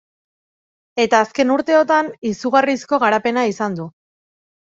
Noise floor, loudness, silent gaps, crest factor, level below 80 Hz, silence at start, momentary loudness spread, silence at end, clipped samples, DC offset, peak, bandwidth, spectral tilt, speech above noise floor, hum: under -90 dBFS; -17 LUFS; 2.18-2.22 s; 18 dB; -62 dBFS; 0.95 s; 9 LU; 0.85 s; under 0.1%; under 0.1%; 0 dBFS; 7.8 kHz; -4.5 dB/octave; over 73 dB; none